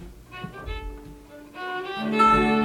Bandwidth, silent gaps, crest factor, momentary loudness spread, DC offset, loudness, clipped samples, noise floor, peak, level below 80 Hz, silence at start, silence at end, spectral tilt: 15.5 kHz; none; 18 dB; 25 LU; under 0.1%; -22 LUFS; under 0.1%; -44 dBFS; -8 dBFS; -42 dBFS; 0 s; 0 s; -6 dB/octave